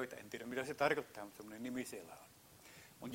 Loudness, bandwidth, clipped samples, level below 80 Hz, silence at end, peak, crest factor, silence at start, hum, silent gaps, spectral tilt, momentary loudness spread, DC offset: -43 LUFS; 16 kHz; under 0.1%; -78 dBFS; 0 s; -20 dBFS; 24 dB; 0 s; none; none; -4 dB/octave; 22 LU; under 0.1%